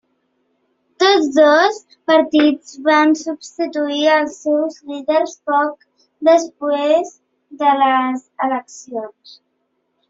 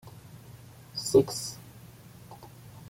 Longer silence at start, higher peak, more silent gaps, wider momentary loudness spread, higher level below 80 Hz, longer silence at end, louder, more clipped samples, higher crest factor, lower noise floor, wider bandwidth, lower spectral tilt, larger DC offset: first, 1 s vs 0.05 s; first, -2 dBFS vs -8 dBFS; neither; second, 14 LU vs 26 LU; second, -66 dBFS vs -60 dBFS; first, 1 s vs 0 s; first, -16 LUFS vs -28 LUFS; neither; second, 16 dB vs 24 dB; first, -69 dBFS vs -50 dBFS; second, 7.8 kHz vs 16.5 kHz; second, -2.5 dB/octave vs -5 dB/octave; neither